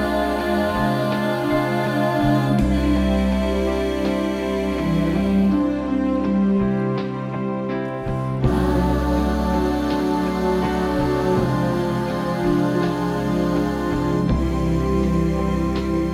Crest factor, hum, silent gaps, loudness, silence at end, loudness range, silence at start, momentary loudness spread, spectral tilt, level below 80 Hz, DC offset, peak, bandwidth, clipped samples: 14 dB; none; none; -21 LUFS; 0 s; 2 LU; 0 s; 4 LU; -7.5 dB/octave; -30 dBFS; under 0.1%; -4 dBFS; 16 kHz; under 0.1%